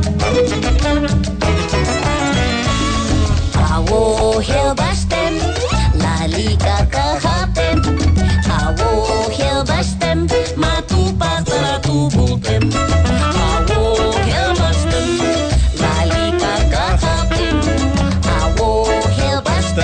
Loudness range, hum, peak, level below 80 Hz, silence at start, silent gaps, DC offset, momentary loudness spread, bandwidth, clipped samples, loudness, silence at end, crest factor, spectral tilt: 1 LU; none; -4 dBFS; -20 dBFS; 0 s; none; under 0.1%; 2 LU; 9.4 kHz; under 0.1%; -16 LUFS; 0 s; 10 dB; -5.5 dB/octave